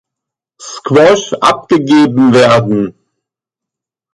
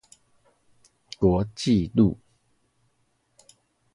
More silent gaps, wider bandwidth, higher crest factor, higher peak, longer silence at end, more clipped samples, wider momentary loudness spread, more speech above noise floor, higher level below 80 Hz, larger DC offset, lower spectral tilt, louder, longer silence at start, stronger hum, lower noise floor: neither; about the same, 11.5 kHz vs 11.5 kHz; second, 12 dB vs 20 dB; first, 0 dBFS vs -6 dBFS; second, 1.25 s vs 1.8 s; neither; second, 12 LU vs 15 LU; first, 75 dB vs 48 dB; about the same, -50 dBFS vs -46 dBFS; neither; second, -5.5 dB/octave vs -7.5 dB/octave; first, -9 LUFS vs -23 LUFS; second, 0.6 s vs 1.2 s; neither; first, -83 dBFS vs -70 dBFS